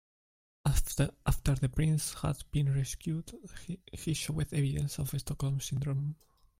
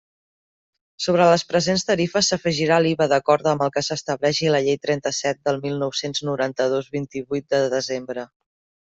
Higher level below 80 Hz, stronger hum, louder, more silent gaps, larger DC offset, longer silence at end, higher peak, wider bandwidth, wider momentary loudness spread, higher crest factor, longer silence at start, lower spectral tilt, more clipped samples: first, -42 dBFS vs -60 dBFS; neither; second, -33 LUFS vs -21 LUFS; neither; neither; second, 0.45 s vs 0.65 s; second, -16 dBFS vs -4 dBFS; first, 16 kHz vs 8.2 kHz; about the same, 10 LU vs 10 LU; about the same, 18 dB vs 18 dB; second, 0.65 s vs 1 s; first, -5.5 dB/octave vs -4 dB/octave; neither